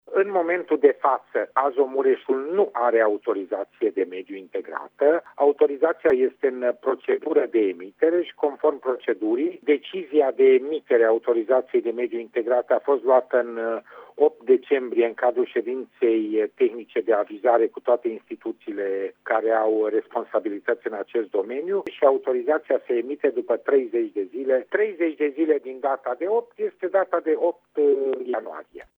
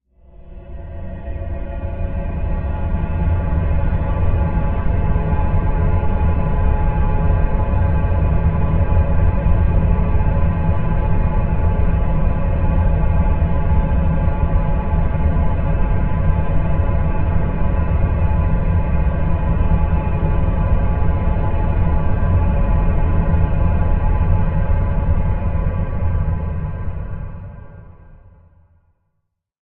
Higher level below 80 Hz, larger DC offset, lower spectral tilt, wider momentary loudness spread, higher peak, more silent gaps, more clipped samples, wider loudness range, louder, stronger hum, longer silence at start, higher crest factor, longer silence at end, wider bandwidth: second, -76 dBFS vs -18 dBFS; neither; second, -7.5 dB/octave vs -13 dB/octave; about the same, 8 LU vs 7 LU; about the same, -4 dBFS vs -4 dBFS; neither; neither; about the same, 3 LU vs 5 LU; second, -23 LUFS vs -19 LUFS; first, 50 Hz at -80 dBFS vs none; second, 0.1 s vs 0.4 s; first, 18 dB vs 12 dB; second, 0.15 s vs 1.45 s; about the same, 3.9 kHz vs 3.7 kHz